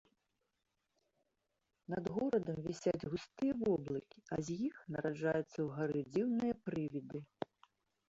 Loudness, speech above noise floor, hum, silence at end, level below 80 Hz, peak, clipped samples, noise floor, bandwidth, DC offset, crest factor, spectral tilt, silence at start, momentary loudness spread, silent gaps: -40 LUFS; 47 dB; none; 0.85 s; -70 dBFS; -22 dBFS; under 0.1%; -86 dBFS; 8 kHz; under 0.1%; 18 dB; -7 dB/octave; 1.9 s; 9 LU; none